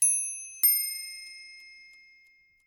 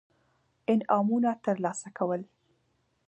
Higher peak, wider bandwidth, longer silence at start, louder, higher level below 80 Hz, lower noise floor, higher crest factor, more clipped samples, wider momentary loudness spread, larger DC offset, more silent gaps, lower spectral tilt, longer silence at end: about the same, -10 dBFS vs -10 dBFS; first, 19 kHz vs 8.8 kHz; second, 0 s vs 0.7 s; first, -25 LUFS vs -29 LUFS; about the same, -78 dBFS vs -78 dBFS; second, -62 dBFS vs -73 dBFS; about the same, 20 dB vs 20 dB; neither; first, 23 LU vs 9 LU; neither; neither; second, 4.5 dB/octave vs -6.5 dB/octave; about the same, 0.85 s vs 0.85 s